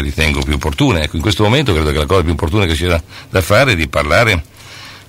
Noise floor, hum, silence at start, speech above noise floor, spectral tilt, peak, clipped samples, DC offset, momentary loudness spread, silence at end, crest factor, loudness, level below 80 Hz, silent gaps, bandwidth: -34 dBFS; none; 0 s; 21 dB; -5 dB/octave; -2 dBFS; under 0.1%; under 0.1%; 8 LU; 0.1 s; 12 dB; -14 LUFS; -24 dBFS; none; 16 kHz